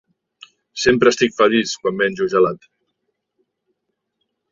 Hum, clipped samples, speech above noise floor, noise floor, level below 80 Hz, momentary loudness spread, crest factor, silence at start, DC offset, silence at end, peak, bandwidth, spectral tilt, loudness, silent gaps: none; under 0.1%; 59 dB; -75 dBFS; -56 dBFS; 7 LU; 18 dB; 0.75 s; under 0.1%; 1.95 s; -2 dBFS; 7.6 kHz; -4 dB/octave; -17 LUFS; none